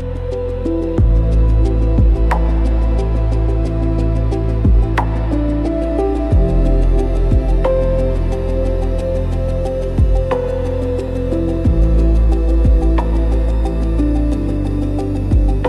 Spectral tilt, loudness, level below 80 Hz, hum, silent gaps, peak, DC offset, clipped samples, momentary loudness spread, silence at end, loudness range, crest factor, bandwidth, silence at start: -9 dB/octave; -17 LUFS; -16 dBFS; none; none; -4 dBFS; under 0.1%; under 0.1%; 5 LU; 0 s; 2 LU; 10 dB; 5.2 kHz; 0 s